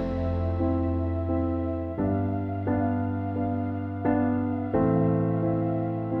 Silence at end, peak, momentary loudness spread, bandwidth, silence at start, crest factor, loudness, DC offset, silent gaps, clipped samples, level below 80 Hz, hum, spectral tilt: 0 s; -12 dBFS; 5 LU; 4.4 kHz; 0 s; 14 dB; -27 LUFS; under 0.1%; none; under 0.1%; -46 dBFS; none; -12 dB/octave